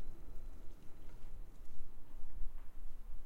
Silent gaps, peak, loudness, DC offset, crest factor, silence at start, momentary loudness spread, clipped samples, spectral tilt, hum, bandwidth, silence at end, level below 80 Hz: none; -24 dBFS; -57 LUFS; under 0.1%; 12 dB; 0 s; 6 LU; under 0.1%; -6.5 dB/octave; none; 1.9 kHz; 0 s; -46 dBFS